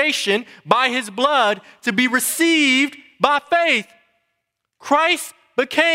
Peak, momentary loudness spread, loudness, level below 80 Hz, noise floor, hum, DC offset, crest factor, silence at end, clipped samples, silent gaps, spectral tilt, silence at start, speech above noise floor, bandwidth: 0 dBFS; 7 LU; -18 LUFS; -66 dBFS; -76 dBFS; none; under 0.1%; 20 dB; 0 s; under 0.1%; none; -2 dB/octave; 0 s; 58 dB; 16 kHz